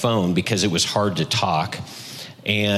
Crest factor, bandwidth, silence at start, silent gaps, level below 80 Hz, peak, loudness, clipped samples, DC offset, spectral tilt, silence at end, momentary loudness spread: 18 dB; 14.5 kHz; 0 s; none; -54 dBFS; -4 dBFS; -21 LUFS; under 0.1%; under 0.1%; -4 dB/octave; 0 s; 14 LU